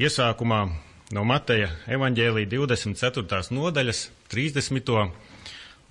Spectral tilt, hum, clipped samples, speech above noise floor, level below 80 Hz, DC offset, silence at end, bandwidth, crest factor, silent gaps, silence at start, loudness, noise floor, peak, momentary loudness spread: -5 dB/octave; none; under 0.1%; 19 dB; -50 dBFS; under 0.1%; 0.2 s; 11 kHz; 16 dB; none; 0 s; -25 LUFS; -44 dBFS; -10 dBFS; 14 LU